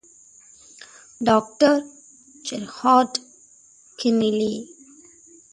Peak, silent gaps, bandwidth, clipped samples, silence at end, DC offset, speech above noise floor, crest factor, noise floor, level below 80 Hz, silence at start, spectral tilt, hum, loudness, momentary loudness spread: -2 dBFS; none; 11.5 kHz; under 0.1%; 0.9 s; under 0.1%; 33 dB; 22 dB; -53 dBFS; -64 dBFS; 1.2 s; -4.5 dB/octave; none; -21 LUFS; 25 LU